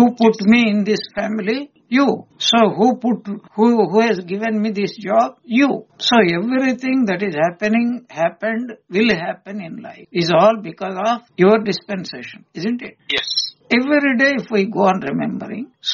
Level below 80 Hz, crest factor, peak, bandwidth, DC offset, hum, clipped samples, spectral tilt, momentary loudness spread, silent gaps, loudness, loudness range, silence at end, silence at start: -60 dBFS; 16 dB; -2 dBFS; 7.2 kHz; under 0.1%; none; under 0.1%; -3.5 dB/octave; 12 LU; none; -17 LUFS; 2 LU; 0 s; 0 s